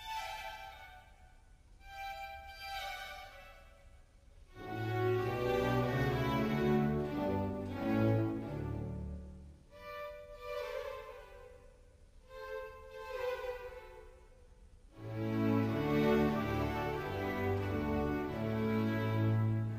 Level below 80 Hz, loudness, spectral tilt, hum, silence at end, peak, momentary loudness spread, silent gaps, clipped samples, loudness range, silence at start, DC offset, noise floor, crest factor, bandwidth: -52 dBFS; -36 LUFS; -7.5 dB/octave; none; 0 s; -20 dBFS; 20 LU; none; under 0.1%; 13 LU; 0 s; under 0.1%; -60 dBFS; 18 dB; 15.5 kHz